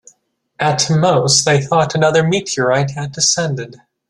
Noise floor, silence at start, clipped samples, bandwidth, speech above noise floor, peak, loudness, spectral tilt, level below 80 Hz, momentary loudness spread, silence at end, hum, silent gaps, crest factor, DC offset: -58 dBFS; 0.6 s; under 0.1%; 12 kHz; 44 dB; 0 dBFS; -14 LUFS; -3.5 dB/octave; -54 dBFS; 9 LU; 0.35 s; none; none; 16 dB; under 0.1%